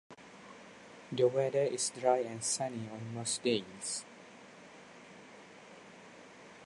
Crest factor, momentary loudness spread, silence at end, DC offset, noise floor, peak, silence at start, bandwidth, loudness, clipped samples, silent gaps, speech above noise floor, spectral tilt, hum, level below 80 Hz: 22 dB; 22 LU; 0 s; under 0.1%; -54 dBFS; -16 dBFS; 0.1 s; 11.5 kHz; -34 LUFS; under 0.1%; none; 21 dB; -3.5 dB/octave; none; -80 dBFS